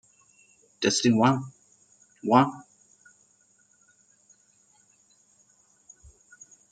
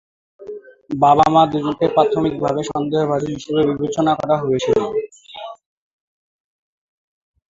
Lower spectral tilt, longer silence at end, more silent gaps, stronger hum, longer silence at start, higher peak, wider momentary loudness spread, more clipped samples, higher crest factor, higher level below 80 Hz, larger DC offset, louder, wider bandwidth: second, -4.5 dB/octave vs -6.5 dB/octave; first, 4.1 s vs 2 s; neither; neither; first, 0.8 s vs 0.4 s; about the same, -4 dBFS vs -2 dBFS; second, 18 LU vs 21 LU; neither; first, 26 dB vs 18 dB; second, -68 dBFS vs -52 dBFS; neither; second, -24 LUFS vs -17 LUFS; first, 9.2 kHz vs 7.8 kHz